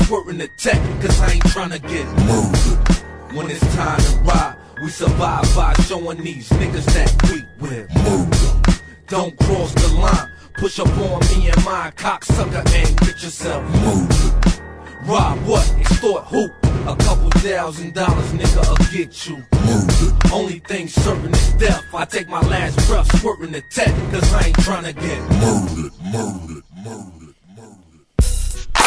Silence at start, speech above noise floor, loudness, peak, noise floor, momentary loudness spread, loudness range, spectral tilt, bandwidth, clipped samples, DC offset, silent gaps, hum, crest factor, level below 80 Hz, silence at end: 0 s; 32 dB; -18 LUFS; -2 dBFS; -47 dBFS; 10 LU; 1 LU; -5.5 dB/octave; 11 kHz; under 0.1%; under 0.1%; none; none; 14 dB; -18 dBFS; 0 s